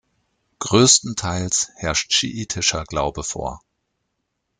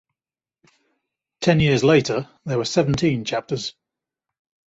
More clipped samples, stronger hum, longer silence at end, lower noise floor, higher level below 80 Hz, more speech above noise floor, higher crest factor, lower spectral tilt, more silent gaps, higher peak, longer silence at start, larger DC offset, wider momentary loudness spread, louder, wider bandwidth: neither; neither; about the same, 1.05 s vs 0.95 s; second, -75 dBFS vs under -90 dBFS; about the same, -44 dBFS vs -48 dBFS; second, 55 dB vs over 70 dB; about the same, 20 dB vs 20 dB; second, -2.5 dB/octave vs -5.5 dB/octave; neither; about the same, -2 dBFS vs -4 dBFS; second, 0.6 s vs 1.4 s; neither; first, 14 LU vs 11 LU; about the same, -19 LUFS vs -20 LUFS; first, 10.5 kHz vs 8 kHz